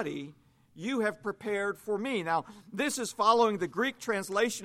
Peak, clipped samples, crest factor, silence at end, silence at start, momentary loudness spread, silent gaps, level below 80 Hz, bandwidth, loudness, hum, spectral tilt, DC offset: -12 dBFS; under 0.1%; 20 dB; 0 s; 0 s; 11 LU; none; -74 dBFS; 16.5 kHz; -30 LUFS; none; -3.5 dB/octave; under 0.1%